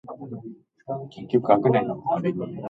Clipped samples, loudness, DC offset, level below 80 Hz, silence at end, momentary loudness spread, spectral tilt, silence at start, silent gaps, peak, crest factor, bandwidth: under 0.1%; -24 LUFS; under 0.1%; -64 dBFS; 0 s; 18 LU; -10 dB/octave; 0.05 s; none; -4 dBFS; 20 dB; 4.9 kHz